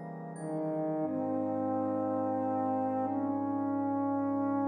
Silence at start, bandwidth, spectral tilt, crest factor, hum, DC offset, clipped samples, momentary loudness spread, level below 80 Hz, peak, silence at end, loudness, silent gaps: 0 s; 9.6 kHz; -9.5 dB/octave; 10 dB; none; under 0.1%; under 0.1%; 3 LU; -82 dBFS; -22 dBFS; 0 s; -33 LUFS; none